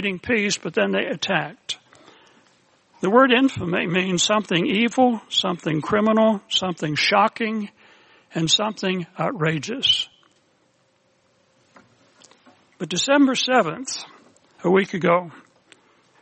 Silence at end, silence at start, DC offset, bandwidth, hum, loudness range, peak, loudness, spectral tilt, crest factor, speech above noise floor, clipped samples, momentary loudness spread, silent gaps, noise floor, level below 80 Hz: 0.85 s; 0 s; under 0.1%; 8.8 kHz; none; 6 LU; -2 dBFS; -21 LUFS; -4 dB/octave; 20 dB; 43 dB; under 0.1%; 13 LU; none; -63 dBFS; -64 dBFS